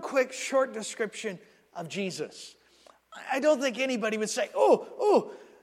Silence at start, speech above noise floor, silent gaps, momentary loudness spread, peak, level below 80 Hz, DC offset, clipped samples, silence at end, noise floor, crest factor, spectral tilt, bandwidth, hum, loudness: 0 s; 31 dB; none; 20 LU; -10 dBFS; -82 dBFS; under 0.1%; under 0.1%; 0.2 s; -59 dBFS; 20 dB; -3.5 dB/octave; 14.5 kHz; none; -28 LUFS